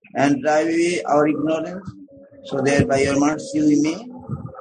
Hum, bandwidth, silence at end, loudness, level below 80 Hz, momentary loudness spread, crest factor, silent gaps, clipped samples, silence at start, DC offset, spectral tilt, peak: none; 9.6 kHz; 0 s; -19 LUFS; -48 dBFS; 15 LU; 18 dB; none; under 0.1%; 0.15 s; under 0.1%; -5.5 dB/octave; -2 dBFS